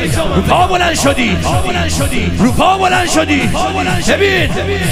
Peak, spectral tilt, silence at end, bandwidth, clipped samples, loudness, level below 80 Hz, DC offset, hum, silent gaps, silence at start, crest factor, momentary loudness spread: 0 dBFS; -4.5 dB/octave; 0 s; 15.5 kHz; under 0.1%; -12 LUFS; -26 dBFS; under 0.1%; none; none; 0 s; 12 dB; 4 LU